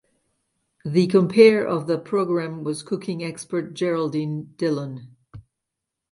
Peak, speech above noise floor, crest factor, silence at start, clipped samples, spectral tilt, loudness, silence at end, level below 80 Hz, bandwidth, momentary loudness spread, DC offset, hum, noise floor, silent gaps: -2 dBFS; 62 dB; 22 dB; 0.85 s; under 0.1%; -6.5 dB/octave; -22 LUFS; 0.7 s; -66 dBFS; 11.5 kHz; 15 LU; under 0.1%; none; -83 dBFS; none